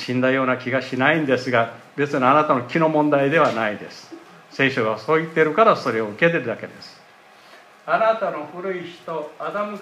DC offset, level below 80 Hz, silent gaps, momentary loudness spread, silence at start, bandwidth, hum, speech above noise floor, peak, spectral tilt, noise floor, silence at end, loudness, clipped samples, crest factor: under 0.1%; -72 dBFS; none; 14 LU; 0 s; 13 kHz; none; 28 dB; -2 dBFS; -6.5 dB/octave; -49 dBFS; 0 s; -20 LUFS; under 0.1%; 18 dB